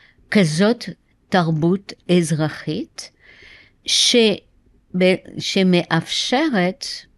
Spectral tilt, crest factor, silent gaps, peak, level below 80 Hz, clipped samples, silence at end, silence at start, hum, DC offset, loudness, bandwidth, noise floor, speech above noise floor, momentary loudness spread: -4.5 dB/octave; 16 dB; none; -4 dBFS; -58 dBFS; under 0.1%; 0.15 s; 0.3 s; none; under 0.1%; -18 LUFS; 12 kHz; -47 dBFS; 29 dB; 13 LU